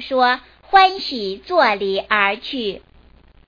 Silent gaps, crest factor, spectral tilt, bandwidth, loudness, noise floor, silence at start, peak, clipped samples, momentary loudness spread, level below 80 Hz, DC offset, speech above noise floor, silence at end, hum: none; 18 dB; -4.5 dB/octave; 5.2 kHz; -18 LUFS; -49 dBFS; 0 s; -2 dBFS; under 0.1%; 12 LU; -52 dBFS; under 0.1%; 31 dB; 0.7 s; none